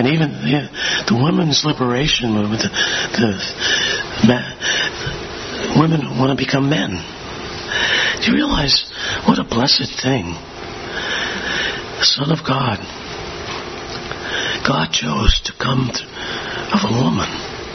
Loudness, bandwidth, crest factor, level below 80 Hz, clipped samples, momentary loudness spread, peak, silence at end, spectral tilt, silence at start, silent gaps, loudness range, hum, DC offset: -17 LUFS; 6.4 kHz; 18 dB; -34 dBFS; under 0.1%; 12 LU; 0 dBFS; 0 s; -4 dB/octave; 0 s; none; 3 LU; none; under 0.1%